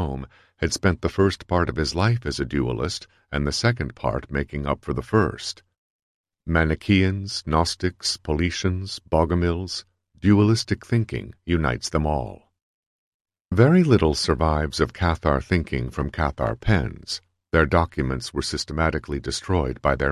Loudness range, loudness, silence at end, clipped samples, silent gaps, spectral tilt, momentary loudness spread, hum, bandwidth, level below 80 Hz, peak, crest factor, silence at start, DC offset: 4 LU; -23 LUFS; 0 s; under 0.1%; 5.78-6.24 s, 12.62-13.25 s, 13.41-13.45 s; -5.5 dB/octave; 10 LU; none; 12.5 kHz; -34 dBFS; -2 dBFS; 20 dB; 0 s; under 0.1%